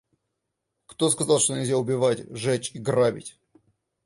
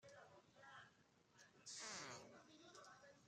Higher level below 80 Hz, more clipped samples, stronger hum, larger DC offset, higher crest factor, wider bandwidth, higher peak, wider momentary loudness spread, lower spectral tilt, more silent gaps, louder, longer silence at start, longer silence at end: first, -64 dBFS vs under -90 dBFS; neither; neither; neither; about the same, 20 dB vs 20 dB; second, 11.5 kHz vs 13 kHz; first, -6 dBFS vs -40 dBFS; second, 7 LU vs 15 LU; first, -4 dB/octave vs -1.5 dB/octave; neither; first, -24 LUFS vs -58 LUFS; first, 0.9 s vs 0 s; first, 0.75 s vs 0 s